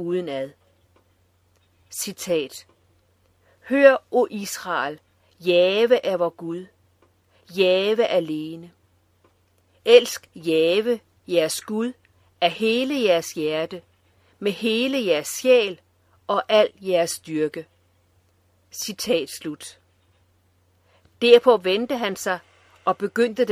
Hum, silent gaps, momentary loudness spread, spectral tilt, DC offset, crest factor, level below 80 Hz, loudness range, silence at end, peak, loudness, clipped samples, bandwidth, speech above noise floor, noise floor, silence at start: none; none; 17 LU; -3.5 dB/octave; under 0.1%; 22 dB; -70 dBFS; 8 LU; 0 s; 0 dBFS; -21 LUFS; under 0.1%; 16 kHz; 42 dB; -63 dBFS; 0 s